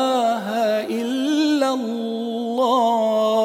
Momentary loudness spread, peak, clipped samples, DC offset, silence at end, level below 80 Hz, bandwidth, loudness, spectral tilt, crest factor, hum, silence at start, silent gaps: 7 LU; -8 dBFS; under 0.1%; under 0.1%; 0 s; -76 dBFS; 17 kHz; -20 LUFS; -4.5 dB/octave; 12 dB; none; 0 s; none